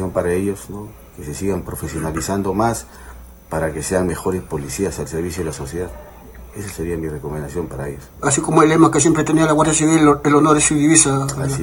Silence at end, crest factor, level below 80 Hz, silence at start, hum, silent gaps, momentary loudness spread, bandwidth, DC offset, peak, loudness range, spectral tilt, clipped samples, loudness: 0 s; 18 dB; -38 dBFS; 0 s; none; none; 17 LU; 19 kHz; under 0.1%; 0 dBFS; 12 LU; -5 dB/octave; under 0.1%; -17 LUFS